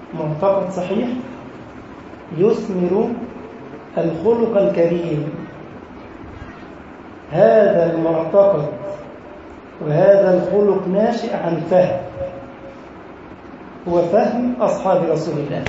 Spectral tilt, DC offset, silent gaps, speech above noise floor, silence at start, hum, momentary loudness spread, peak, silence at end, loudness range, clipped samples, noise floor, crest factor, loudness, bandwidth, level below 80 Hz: -8 dB/octave; under 0.1%; none; 21 dB; 0 s; none; 23 LU; -2 dBFS; 0 s; 5 LU; under 0.1%; -37 dBFS; 18 dB; -17 LUFS; 8 kHz; -50 dBFS